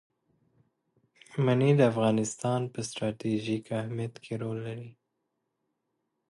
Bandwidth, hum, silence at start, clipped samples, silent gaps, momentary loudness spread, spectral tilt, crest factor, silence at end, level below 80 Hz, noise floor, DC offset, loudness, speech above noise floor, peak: 11.5 kHz; none; 1.3 s; under 0.1%; none; 14 LU; -6.5 dB/octave; 20 dB; 1.4 s; -70 dBFS; -81 dBFS; under 0.1%; -29 LUFS; 53 dB; -10 dBFS